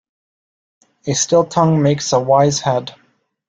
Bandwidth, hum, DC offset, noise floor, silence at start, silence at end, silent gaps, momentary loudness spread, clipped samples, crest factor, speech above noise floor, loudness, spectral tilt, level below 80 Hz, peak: 9.4 kHz; none; under 0.1%; under -90 dBFS; 1.05 s; 0.6 s; none; 9 LU; under 0.1%; 16 dB; over 75 dB; -15 LUFS; -5 dB/octave; -54 dBFS; -2 dBFS